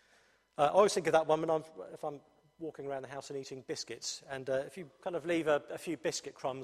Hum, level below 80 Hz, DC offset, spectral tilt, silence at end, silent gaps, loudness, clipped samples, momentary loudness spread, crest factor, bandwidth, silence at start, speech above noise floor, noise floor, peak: none; -74 dBFS; under 0.1%; -4 dB/octave; 0 s; none; -34 LUFS; under 0.1%; 16 LU; 22 dB; 14 kHz; 0.6 s; 34 dB; -68 dBFS; -14 dBFS